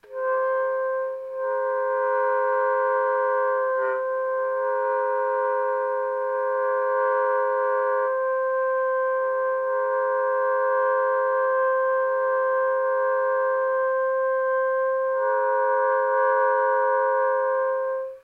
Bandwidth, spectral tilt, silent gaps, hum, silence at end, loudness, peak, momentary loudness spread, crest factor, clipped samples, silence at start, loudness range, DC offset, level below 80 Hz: 3.3 kHz; -4 dB/octave; none; none; 0.05 s; -23 LUFS; -12 dBFS; 4 LU; 12 dB; under 0.1%; 0.1 s; 2 LU; under 0.1%; -76 dBFS